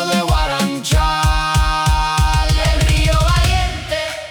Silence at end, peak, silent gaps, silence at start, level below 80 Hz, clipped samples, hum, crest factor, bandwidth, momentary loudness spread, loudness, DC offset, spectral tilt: 0 s; -6 dBFS; none; 0 s; -18 dBFS; under 0.1%; none; 10 dB; over 20 kHz; 5 LU; -16 LUFS; under 0.1%; -4.5 dB/octave